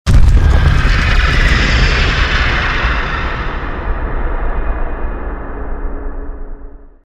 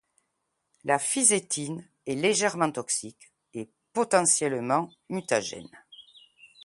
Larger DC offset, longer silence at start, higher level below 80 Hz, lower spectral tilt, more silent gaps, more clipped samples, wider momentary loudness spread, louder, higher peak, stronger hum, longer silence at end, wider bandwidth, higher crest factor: neither; second, 0.05 s vs 0.85 s; first, -14 dBFS vs -72 dBFS; first, -5.5 dB/octave vs -2.5 dB/octave; neither; neither; second, 15 LU vs 19 LU; first, -15 LUFS vs -26 LUFS; first, 0 dBFS vs -6 dBFS; neither; about the same, 0.2 s vs 0.2 s; second, 9.4 kHz vs 11.5 kHz; second, 12 dB vs 24 dB